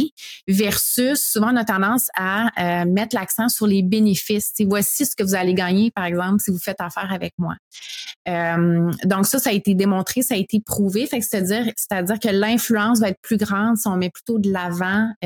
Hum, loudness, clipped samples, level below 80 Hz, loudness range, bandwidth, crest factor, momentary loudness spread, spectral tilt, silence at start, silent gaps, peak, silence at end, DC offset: none; -20 LUFS; under 0.1%; -56 dBFS; 3 LU; 18 kHz; 14 dB; 8 LU; -4.5 dB/octave; 0 s; 0.11-0.17 s, 0.43-0.47 s, 7.33-7.38 s, 7.59-7.71 s, 8.16-8.25 s, 13.17-13.23 s, 15.16-15.21 s; -4 dBFS; 0 s; under 0.1%